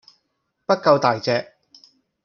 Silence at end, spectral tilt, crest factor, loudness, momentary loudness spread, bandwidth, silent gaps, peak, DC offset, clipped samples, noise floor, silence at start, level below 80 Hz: 0.8 s; -5.5 dB/octave; 20 dB; -19 LUFS; 9 LU; 6.8 kHz; none; -2 dBFS; under 0.1%; under 0.1%; -74 dBFS; 0.7 s; -68 dBFS